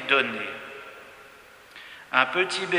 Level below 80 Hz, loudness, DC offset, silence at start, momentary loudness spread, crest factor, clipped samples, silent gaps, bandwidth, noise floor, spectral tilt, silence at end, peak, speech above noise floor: -72 dBFS; -24 LUFS; under 0.1%; 0 s; 24 LU; 26 dB; under 0.1%; none; 16 kHz; -50 dBFS; -3 dB/octave; 0 s; -2 dBFS; 25 dB